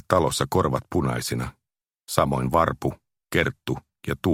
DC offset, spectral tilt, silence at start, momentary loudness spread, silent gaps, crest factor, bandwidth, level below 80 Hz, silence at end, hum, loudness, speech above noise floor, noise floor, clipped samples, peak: under 0.1%; -5.5 dB/octave; 0.1 s; 10 LU; none; 24 dB; 16.5 kHz; -44 dBFS; 0 s; none; -25 LUFS; 61 dB; -85 dBFS; under 0.1%; -2 dBFS